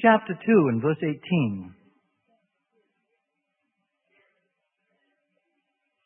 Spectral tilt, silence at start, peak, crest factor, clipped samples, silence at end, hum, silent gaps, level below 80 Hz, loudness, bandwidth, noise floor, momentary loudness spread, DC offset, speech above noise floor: -11.5 dB/octave; 0 s; -4 dBFS; 22 dB; under 0.1%; 4.35 s; none; none; -72 dBFS; -23 LUFS; 3.5 kHz; -79 dBFS; 9 LU; under 0.1%; 56 dB